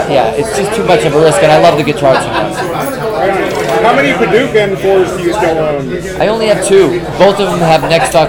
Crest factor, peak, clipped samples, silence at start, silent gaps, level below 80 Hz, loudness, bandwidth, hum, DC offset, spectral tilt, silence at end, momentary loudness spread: 10 dB; 0 dBFS; 1%; 0 s; none; -36 dBFS; -10 LUFS; over 20 kHz; none; under 0.1%; -5 dB/octave; 0 s; 7 LU